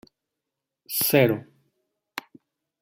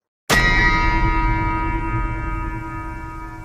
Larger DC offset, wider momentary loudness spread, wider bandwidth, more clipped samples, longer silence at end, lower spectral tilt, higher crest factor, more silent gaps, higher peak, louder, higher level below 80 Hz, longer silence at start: neither; first, 19 LU vs 15 LU; about the same, 16.5 kHz vs 16 kHz; neither; first, 0.6 s vs 0 s; about the same, -4.5 dB/octave vs -4.5 dB/octave; first, 22 dB vs 16 dB; neither; about the same, -6 dBFS vs -4 dBFS; about the same, -22 LUFS vs -20 LUFS; second, -68 dBFS vs -24 dBFS; first, 0.9 s vs 0.3 s